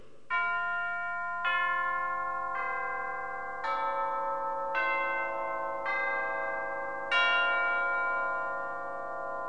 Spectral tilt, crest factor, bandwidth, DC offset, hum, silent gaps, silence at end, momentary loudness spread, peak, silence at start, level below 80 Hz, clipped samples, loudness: -3 dB/octave; 16 dB; 9.8 kHz; 0.6%; 50 Hz at -65 dBFS; none; 0 s; 9 LU; -14 dBFS; 0.3 s; -66 dBFS; under 0.1%; -31 LUFS